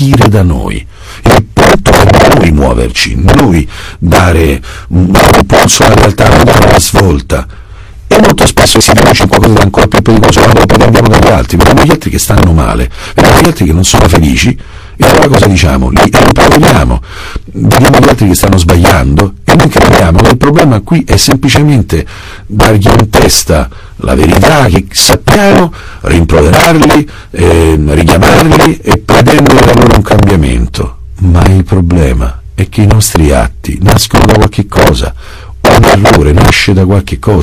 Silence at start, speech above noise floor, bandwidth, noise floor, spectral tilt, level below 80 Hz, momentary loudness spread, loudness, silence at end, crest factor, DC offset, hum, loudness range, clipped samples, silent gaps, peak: 0 s; 21 dB; over 20 kHz; -26 dBFS; -5 dB/octave; -16 dBFS; 9 LU; -5 LUFS; 0 s; 6 dB; 2%; none; 2 LU; 7%; none; 0 dBFS